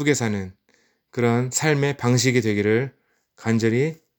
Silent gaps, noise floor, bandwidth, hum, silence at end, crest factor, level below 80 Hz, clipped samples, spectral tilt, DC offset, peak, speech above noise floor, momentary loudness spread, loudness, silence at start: none; -64 dBFS; over 20 kHz; none; 0.25 s; 18 dB; -66 dBFS; under 0.1%; -5 dB/octave; under 0.1%; -4 dBFS; 43 dB; 12 LU; -21 LUFS; 0 s